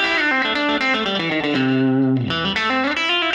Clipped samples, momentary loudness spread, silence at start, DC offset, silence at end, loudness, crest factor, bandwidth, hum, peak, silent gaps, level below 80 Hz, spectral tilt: under 0.1%; 3 LU; 0 s; under 0.1%; 0 s; -18 LUFS; 12 dB; 9 kHz; none; -8 dBFS; none; -52 dBFS; -5.5 dB/octave